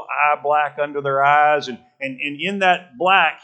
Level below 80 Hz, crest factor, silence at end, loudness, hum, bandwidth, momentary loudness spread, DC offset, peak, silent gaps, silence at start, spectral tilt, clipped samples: -78 dBFS; 18 dB; 0.1 s; -18 LUFS; none; 8.6 kHz; 11 LU; under 0.1%; 0 dBFS; none; 0 s; -4.5 dB/octave; under 0.1%